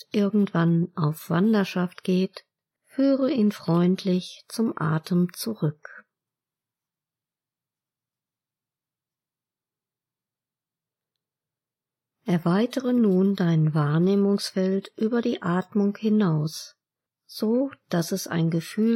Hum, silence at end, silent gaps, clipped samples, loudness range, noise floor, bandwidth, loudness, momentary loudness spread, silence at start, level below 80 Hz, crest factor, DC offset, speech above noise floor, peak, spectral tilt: none; 0 s; none; under 0.1%; 8 LU; under -90 dBFS; 16 kHz; -24 LUFS; 7 LU; 0.15 s; -76 dBFS; 16 dB; under 0.1%; over 67 dB; -10 dBFS; -7 dB/octave